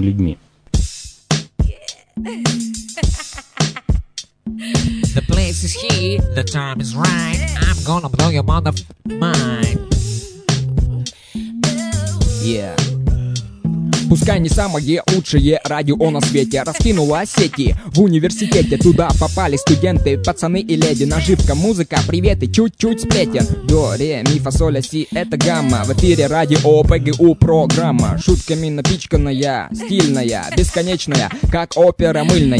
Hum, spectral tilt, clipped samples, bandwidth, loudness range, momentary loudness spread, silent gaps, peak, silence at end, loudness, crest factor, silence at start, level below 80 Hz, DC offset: none; -5.5 dB/octave; under 0.1%; 11 kHz; 6 LU; 9 LU; none; 0 dBFS; 0 s; -16 LUFS; 16 dB; 0 s; -24 dBFS; under 0.1%